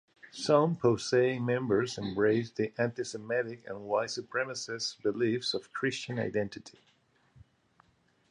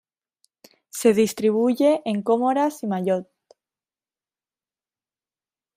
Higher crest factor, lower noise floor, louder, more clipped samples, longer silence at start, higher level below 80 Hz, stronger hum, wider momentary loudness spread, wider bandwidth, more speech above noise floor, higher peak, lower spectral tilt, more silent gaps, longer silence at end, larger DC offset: about the same, 22 dB vs 20 dB; second, -67 dBFS vs under -90 dBFS; second, -31 LUFS vs -21 LUFS; neither; second, 0.25 s vs 0.95 s; about the same, -68 dBFS vs -70 dBFS; neither; about the same, 9 LU vs 7 LU; second, 11 kHz vs 15.5 kHz; second, 37 dB vs over 70 dB; second, -10 dBFS vs -4 dBFS; about the same, -5 dB/octave vs -5.5 dB/octave; neither; second, 1.6 s vs 2.55 s; neither